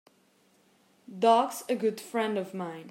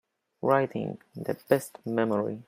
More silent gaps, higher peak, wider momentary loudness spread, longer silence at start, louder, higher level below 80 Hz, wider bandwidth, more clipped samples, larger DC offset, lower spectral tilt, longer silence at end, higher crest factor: neither; about the same, -10 dBFS vs -8 dBFS; first, 14 LU vs 10 LU; first, 1.1 s vs 0.45 s; about the same, -28 LUFS vs -29 LUFS; second, -88 dBFS vs -72 dBFS; about the same, 16 kHz vs 16 kHz; neither; neither; second, -4.5 dB/octave vs -6.5 dB/octave; about the same, 0 s vs 0.05 s; about the same, 20 dB vs 20 dB